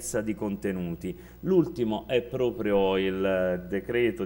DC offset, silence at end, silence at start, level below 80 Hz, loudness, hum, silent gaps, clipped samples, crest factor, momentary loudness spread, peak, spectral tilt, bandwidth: under 0.1%; 0 s; 0 s; -50 dBFS; -28 LUFS; none; none; under 0.1%; 16 dB; 8 LU; -10 dBFS; -6 dB/octave; 16.5 kHz